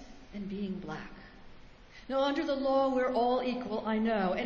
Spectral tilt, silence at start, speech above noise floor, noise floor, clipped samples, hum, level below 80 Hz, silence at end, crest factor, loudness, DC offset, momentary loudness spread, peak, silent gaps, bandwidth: -6.5 dB/octave; 0 s; 22 dB; -52 dBFS; under 0.1%; none; -58 dBFS; 0 s; 14 dB; -31 LUFS; under 0.1%; 17 LU; -18 dBFS; none; 7.4 kHz